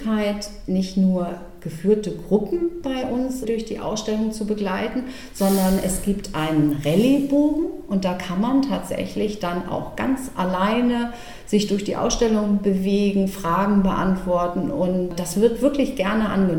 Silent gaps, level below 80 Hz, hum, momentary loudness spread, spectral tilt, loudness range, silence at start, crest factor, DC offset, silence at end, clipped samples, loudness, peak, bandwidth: none; -40 dBFS; none; 7 LU; -6 dB/octave; 3 LU; 0 s; 16 dB; 0.8%; 0 s; under 0.1%; -22 LUFS; -4 dBFS; 18 kHz